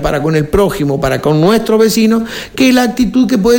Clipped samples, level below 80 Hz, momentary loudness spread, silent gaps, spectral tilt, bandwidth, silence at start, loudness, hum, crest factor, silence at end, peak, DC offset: under 0.1%; -32 dBFS; 4 LU; none; -5.5 dB/octave; 17 kHz; 0 s; -11 LUFS; none; 10 dB; 0 s; 0 dBFS; under 0.1%